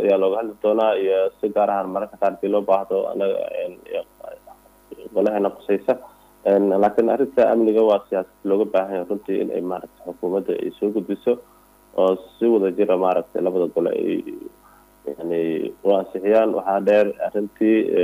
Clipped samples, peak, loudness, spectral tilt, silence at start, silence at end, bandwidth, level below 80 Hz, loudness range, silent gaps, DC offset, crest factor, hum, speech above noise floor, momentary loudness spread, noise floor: under 0.1%; -6 dBFS; -21 LUFS; -7.5 dB/octave; 0 s; 0 s; 15.5 kHz; -62 dBFS; 5 LU; none; under 0.1%; 14 dB; none; 31 dB; 12 LU; -51 dBFS